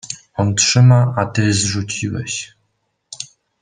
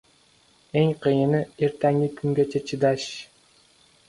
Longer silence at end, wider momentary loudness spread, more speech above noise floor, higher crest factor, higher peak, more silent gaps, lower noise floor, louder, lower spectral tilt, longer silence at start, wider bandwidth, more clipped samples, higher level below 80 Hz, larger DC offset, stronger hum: second, 0.35 s vs 0.85 s; first, 20 LU vs 7 LU; first, 54 dB vs 37 dB; about the same, 16 dB vs 18 dB; first, -2 dBFS vs -8 dBFS; neither; first, -69 dBFS vs -59 dBFS; first, -16 LUFS vs -24 LUFS; second, -4.5 dB/octave vs -7 dB/octave; second, 0.05 s vs 0.75 s; second, 9.8 kHz vs 11.5 kHz; neither; first, -52 dBFS vs -62 dBFS; neither; neither